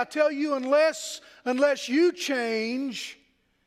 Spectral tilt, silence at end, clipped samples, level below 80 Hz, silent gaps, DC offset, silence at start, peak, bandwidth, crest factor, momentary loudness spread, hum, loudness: -2.5 dB/octave; 0.5 s; under 0.1%; -78 dBFS; none; under 0.1%; 0 s; -10 dBFS; 15 kHz; 16 dB; 12 LU; none; -26 LUFS